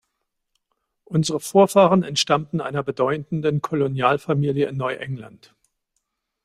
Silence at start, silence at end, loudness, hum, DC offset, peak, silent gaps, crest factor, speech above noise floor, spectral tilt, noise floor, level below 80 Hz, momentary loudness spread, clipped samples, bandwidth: 1.1 s; 1.15 s; -21 LUFS; none; under 0.1%; -2 dBFS; none; 20 dB; 56 dB; -5.5 dB/octave; -77 dBFS; -62 dBFS; 10 LU; under 0.1%; 15.5 kHz